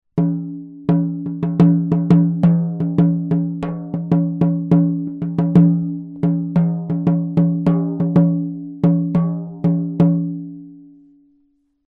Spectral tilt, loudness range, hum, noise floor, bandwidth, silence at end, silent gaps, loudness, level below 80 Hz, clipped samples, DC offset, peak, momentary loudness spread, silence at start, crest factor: -11.5 dB/octave; 2 LU; none; -62 dBFS; 3.4 kHz; 1.05 s; none; -18 LUFS; -52 dBFS; under 0.1%; under 0.1%; 0 dBFS; 11 LU; 0.15 s; 18 dB